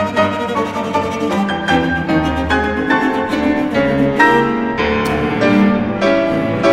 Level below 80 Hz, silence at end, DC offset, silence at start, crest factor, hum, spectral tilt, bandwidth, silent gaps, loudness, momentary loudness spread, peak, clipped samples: -34 dBFS; 0 s; under 0.1%; 0 s; 14 dB; none; -6 dB/octave; 16 kHz; none; -15 LUFS; 6 LU; 0 dBFS; under 0.1%